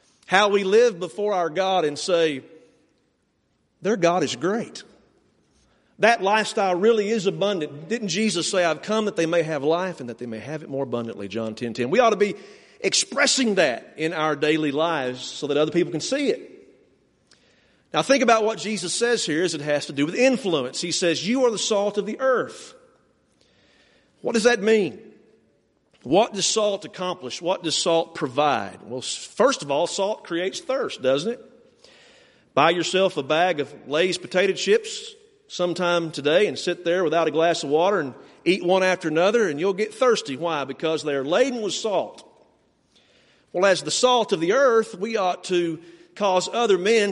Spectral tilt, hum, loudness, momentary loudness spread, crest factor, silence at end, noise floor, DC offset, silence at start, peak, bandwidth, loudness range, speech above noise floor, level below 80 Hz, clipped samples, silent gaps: -3.5 dB/octave; none; -22 LUFS; 10 LU; 22 dB; 0 s; -69 dBFS; under 0.1%; 0.3 s; -2 dBFS; 11.5 kHz; 4 LU; 47 dB; -70 dBFS; under 0.1%; none